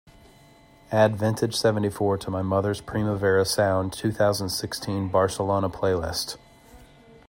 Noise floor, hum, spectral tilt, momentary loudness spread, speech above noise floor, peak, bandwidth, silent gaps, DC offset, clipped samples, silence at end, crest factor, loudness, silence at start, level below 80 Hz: -53 dBFS; none; -5 dB/octave; 7 LU; 29 dB; -6 dBFS; 16.5 kHz; none; under 0.1%; under 0.1%; 0.45 s; 18 dB; -24 LUFS; 0.9 s; -54 dBFS